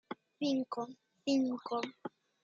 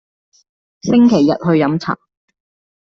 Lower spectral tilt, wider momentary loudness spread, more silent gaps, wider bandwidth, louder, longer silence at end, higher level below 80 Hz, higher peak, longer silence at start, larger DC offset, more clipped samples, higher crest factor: second, -4.5 dB/octave vs -7 dB/octave; about the same, 17 LU vs 15 LU; neither; about the same, 7.6 kHz vs 7 kHz; second, -37 LUFS vs -14 LUFS; second, 0.35 s vs 1 s; second, -86 dBFS vs -54 dBFS; second, -22 dBFS vs -2 dBFS; second, 0.1 s vs 0.85 s; neither; neither; about the same, 16 dB vs 14 dB